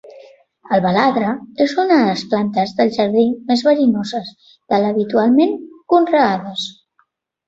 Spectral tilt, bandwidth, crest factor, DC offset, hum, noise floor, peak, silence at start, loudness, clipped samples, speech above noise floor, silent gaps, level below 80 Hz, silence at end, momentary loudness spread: -6 dB/octave; 8 kHz; 16 dB; under 0.1%; none; -63 dBFS; -2 dBFS; 0.05 s; -16 LUFS; under 0.1%; 47 dB; none; -60 dBFS; 0.75 s; 11 LU